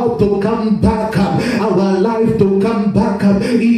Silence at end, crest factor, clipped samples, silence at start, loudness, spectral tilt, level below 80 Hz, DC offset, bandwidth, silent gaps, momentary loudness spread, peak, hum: 0 s; 12 dB; under 0.1%; 0 s; -14 LUFS; -8 dB/octave; -36 dBFS; under 0.1%; 12.5 kHz; none; 2 LU; 0 dBFS; none